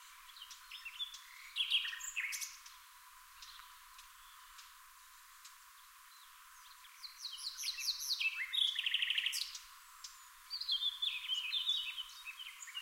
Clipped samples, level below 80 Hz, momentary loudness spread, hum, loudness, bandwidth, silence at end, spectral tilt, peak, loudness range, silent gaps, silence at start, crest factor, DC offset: under 0.1%; -78 dBFS; 23 LU; none; -37 LUFS; 16 kHz; 0 s; 7.5 dB/octave; -22 dBFS; 19 LU; none; 0 s; 22 dB; under 0.1%